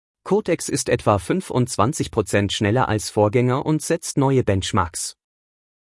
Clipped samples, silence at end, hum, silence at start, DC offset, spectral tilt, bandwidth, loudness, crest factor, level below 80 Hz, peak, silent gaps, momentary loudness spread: under 0.1%; 0.75 s; none; 0.25 s; under 0.1%; -5 dB/octave; 12 kHz; -21 LUFS; 18 dB; -50 dBFS; -2 dBFS; none; 4 LU